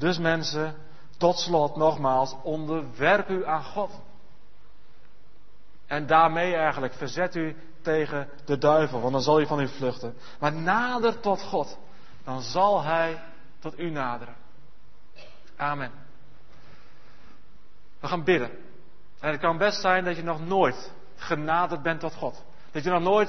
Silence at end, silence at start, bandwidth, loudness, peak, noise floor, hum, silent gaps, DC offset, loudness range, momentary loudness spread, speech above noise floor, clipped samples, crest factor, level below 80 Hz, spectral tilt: 0 s; 0 s; 6.4 kHz; -26 LUFS; -6 dBFS; -59 dBFS; none; none; 2%; 10 LU; 14 LU; 34 dB; under 0.1%; 20 dB; -60 dBFS; -5.5 dB/octave